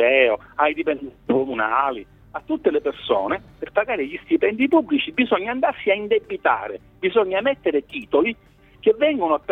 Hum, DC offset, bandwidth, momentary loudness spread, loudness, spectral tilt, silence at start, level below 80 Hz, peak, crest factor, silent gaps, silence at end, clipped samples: none; under 0.1%; 4.1 kHz; 8 LU; -21 LUFS; -7 dB/octave; 0 s; -56 dBFS; -2 dBFS; 18 dB; none; 0 s; under 0.1%